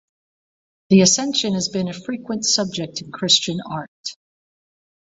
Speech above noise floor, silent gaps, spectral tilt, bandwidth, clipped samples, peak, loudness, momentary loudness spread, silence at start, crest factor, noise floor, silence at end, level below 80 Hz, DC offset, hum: over 70 dB; 3.88-4.04 s; -3.5 dB/octave; 8 kHz; under 0.1%; -2 dBFS; -18 LUFS; 16 LU; 0.9 s; 20 dB; under -90 dBFS; 0.9 s; -60 dBFS; under 0.1%; none